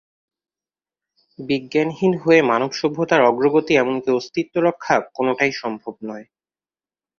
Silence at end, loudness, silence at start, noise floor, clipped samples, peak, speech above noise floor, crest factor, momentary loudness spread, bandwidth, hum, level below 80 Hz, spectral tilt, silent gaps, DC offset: 0.95 s; -19 LUFS; 1.4 s; under -90 dBFS; under 0.1%; -2 dBFS; over 71 dB; 18 dB; 15 LU; 7.2 kHz; none; -62 dBFS; -5.5 dB/octave; none; under 0.1%